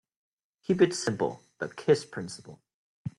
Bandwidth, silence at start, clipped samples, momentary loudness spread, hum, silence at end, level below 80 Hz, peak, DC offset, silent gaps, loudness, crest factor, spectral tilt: 12 kHz; 0.7 s; under 0.1%; 17 LU; none; 0.1 s; -70 dBFS; -8 dBFS; under 0.1%; 2.74-3.05 s; -29 LUFS; 22 dB; -5.5 dB/octave